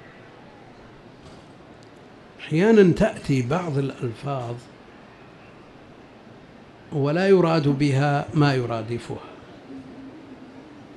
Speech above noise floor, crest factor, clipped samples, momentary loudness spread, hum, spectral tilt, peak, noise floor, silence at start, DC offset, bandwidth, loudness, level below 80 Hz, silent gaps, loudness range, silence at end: 26 dB; 20 dB; under 0.1%; 25 LU; none; -7.5 dB/octave; -4 dBFS; -47 dBFS; 0.2 s; under 0.1%; 11 kHz; -22 LUFS; -52 dBFS; none; 9 LU; 0.05 s